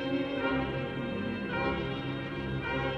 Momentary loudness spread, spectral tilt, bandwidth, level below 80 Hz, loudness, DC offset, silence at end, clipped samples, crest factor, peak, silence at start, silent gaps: 4 LU; -7.5 dB/octave; 7.8 kHz; -48 dBFS; -33 LUFS; under 0.1%; 0 s; under 0.1%; 14 dB; -18 dBFS; 0 s; none